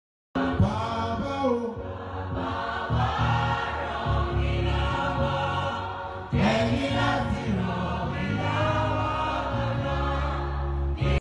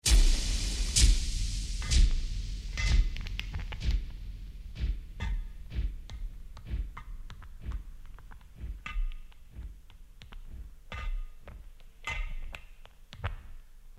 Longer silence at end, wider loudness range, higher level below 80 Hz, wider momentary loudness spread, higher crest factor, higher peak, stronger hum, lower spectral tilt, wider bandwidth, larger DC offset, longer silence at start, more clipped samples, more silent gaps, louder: about the same, 0 s vs 0 s; second, 2 LU vs 15 LU; about the same, -34 dBFS vs -32 dBFS; second, 6 LU vs 23 LU; second, 14 dB vs 20 dB; about the same, -12 dBFS vs -10 dBFS; neither; first, -7 dB/octave vs -2.5 dB/octave; second, 10 kHz vs 14.5 kHz; second, under 0.1% vs 0.1%; first, 0.35 s vs 0.05 s; neither; neither; first, -27 LUFS vs -34 LUFS